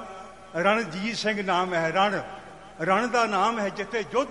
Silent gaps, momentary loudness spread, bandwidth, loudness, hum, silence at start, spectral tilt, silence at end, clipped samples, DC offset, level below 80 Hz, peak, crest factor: none; 17 LU; 11.5 kHz; -25 LUFS; none; 0 s; -4.5 dB/octave; 0 s; under 0.1%; 0.1%; -60 dBFS; -6 dBFS; 20 dB